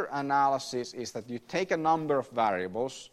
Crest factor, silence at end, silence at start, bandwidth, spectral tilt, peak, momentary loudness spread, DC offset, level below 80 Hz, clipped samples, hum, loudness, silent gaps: 16 dB; 0.05 s; 0 s; 13.5 kHz; -4.5 dB/octave; -14 dBFS; 11 LU; under 0.1%; -70 dBFS; under 0.1%; none; -30 LUFS; none